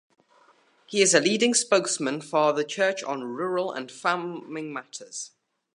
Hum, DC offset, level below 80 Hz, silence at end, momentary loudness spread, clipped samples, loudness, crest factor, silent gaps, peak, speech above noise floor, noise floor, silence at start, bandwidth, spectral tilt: none; under 0.1%; -80 dBFS; 0.5 s; 16 LU; under 0.1%; -25 LUFS; 22 dB; none; -4 dBFS; 35 dB; -61 dBFS; 0.9 s; 11.5 kHz; -2.5 dB/octave